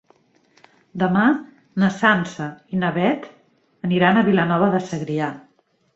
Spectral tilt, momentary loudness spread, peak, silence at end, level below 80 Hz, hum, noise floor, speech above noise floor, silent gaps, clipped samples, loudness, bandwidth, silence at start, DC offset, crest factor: -7 dB/octave; 13 LU; -2 dBFS; 0.55 s; -60 dBFS; none; -59 dBFS; 39 dB; none; under 0.1%; -20 LUFS; 7.8 kHz; 0.95 s; under 0.1%; 18 dB